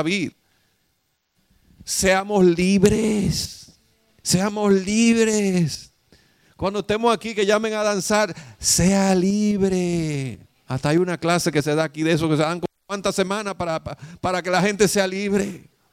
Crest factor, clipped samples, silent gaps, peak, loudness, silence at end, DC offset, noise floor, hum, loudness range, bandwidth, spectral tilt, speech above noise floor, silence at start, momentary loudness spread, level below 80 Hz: 20 dB; under 0.1%; none; -2 dBFS; -21 LUFS; 0.35 s; under 0.1%; -70 dBFS; none; 3 LU; 16 kHz; -4.5 dB/octave; 50 dB; 0 s; 12 LU; -46 dBFS